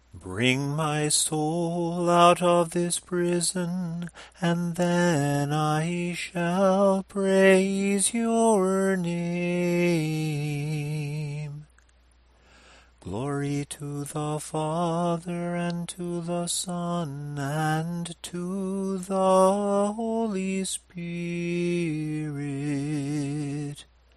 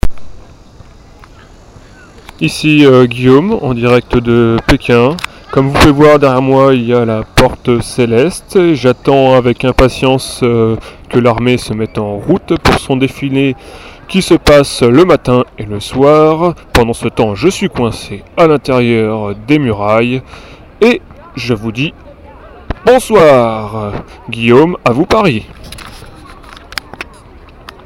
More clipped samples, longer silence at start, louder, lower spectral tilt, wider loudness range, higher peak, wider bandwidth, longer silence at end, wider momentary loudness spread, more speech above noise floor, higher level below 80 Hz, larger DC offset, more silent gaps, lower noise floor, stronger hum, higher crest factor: second, under 0.1% vs 0.7%; about the same, 0.15 s vs 0.05 s; second, -26 LUFS vs -10 LUFS; about the same, -5 dB/octave vs -6 dB/octave; first, 9 LU vs 4 LU; second, -6 dBFS vs 0 dBFS; second, 13 kHz vs 16.5 kHz; second, 0.35 s vs 0.85 s; about the same, 12 LU vs 14 LU; first, 34 dB vs 27 dB; second, -60 dBFS vs -28 dBFS; neither; neither; first, -59 dBFS vs -37 dBFS; neither; first, 20 dB vs 10 dB